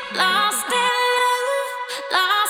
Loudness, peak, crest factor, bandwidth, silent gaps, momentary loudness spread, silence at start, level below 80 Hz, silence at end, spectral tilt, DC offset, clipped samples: -19 LUFS; -4 dBFS; 16 dB; 19.5 kHz; none; 7 LU; 0 s; -72 dBFS; 0 s; 0 dB/octave; under 0.1%; under 0.1%